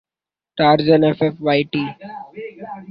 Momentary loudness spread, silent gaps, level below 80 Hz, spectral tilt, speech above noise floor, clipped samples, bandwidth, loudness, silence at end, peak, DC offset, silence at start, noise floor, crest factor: 20 LU; none; -58 dBFS; -10 dB/octave; 73 dB; under 0.1%; 5.4 kHz; -17 LUFS; 0.05 s; -2 dBFS; under 0.1%; 0.55 s; -90 dBFS; 16 dB